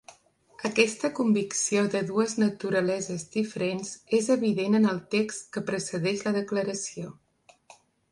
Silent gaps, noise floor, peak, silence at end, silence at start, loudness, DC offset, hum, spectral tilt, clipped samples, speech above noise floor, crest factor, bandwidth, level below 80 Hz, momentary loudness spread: none; -57 dBFS; -6 dBFS; 1 s; 0.1 s; -27 LUFS; under 0.1%; none; -4.5 dB/octave; under 0.1%; 31 dB; 22 dB; 11.5 kHz; -70 dBFS; 8 LU